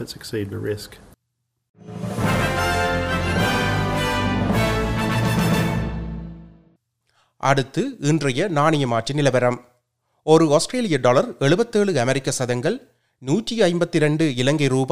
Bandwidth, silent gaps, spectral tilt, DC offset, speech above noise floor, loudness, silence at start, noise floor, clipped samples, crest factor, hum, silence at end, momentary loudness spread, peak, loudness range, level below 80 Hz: 16 kHz; 1.69-1.74 s; -5.5 dB/octave; under 0.1%; 56 dB; -20 LUFS; 0 s; -75 dBFS; under 0.1%; 20 dB; none; 0 s; 11 LU; 0 dBFS; 4 LU; -38 dBFS